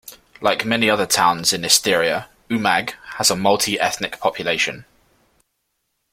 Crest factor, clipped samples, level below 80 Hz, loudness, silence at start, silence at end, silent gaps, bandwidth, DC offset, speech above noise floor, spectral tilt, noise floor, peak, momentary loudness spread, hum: 20 dB; under 0.1%; -56 dBFS; -18 LUFS; 0.05 s; 1.3 s; none; 16.5 kHz; under 0.1%; 54 dB; -2 dB/octave; -73 dBFS; 0 dBFS; 8 LU; none